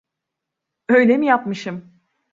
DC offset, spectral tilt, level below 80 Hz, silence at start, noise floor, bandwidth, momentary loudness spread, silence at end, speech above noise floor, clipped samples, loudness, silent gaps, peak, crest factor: under 0.1%; -6.5 dB/octave; -68 dBFS; 0.9 s; -82 dBFS; 7.6 kHz; 20 LU; 0.55 s; 65 dB; under 0.1%; -17 LUFS; none; -2 dBFS; 18 dB